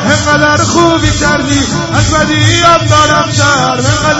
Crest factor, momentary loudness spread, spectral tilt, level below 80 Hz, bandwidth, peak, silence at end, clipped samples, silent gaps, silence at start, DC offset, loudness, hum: 8 dB; 4 LU; -4 dB/octave; -26 dBFS; 11 kHz; 0 dBFS; 0 s; 0.5%; none; 0 s; under 0.1%; -8 LUFS; none